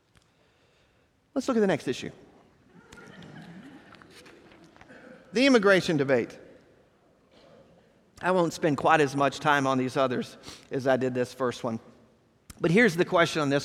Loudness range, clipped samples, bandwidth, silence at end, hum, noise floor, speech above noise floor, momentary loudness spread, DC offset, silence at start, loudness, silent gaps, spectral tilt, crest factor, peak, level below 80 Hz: 7 LU; under 0.1%; 15 kHz; 0 s; none; -66 dBFS; 41 dB; 21 LU; under 0.1%; 1.35 s; -25 LUFS; none; -5.5 dB/octave; 22 dB; -6 dBFS; -64 dBFS